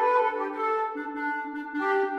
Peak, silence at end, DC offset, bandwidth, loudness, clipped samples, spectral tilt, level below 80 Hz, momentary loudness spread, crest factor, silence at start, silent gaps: -12 dBFS; 0 s; under 0.1%; 8.6 kHz; -28 LUFS; under 0.1%; -4 dB/octave; -74 dBFS; 7 LU; 16 dB; 0 s; none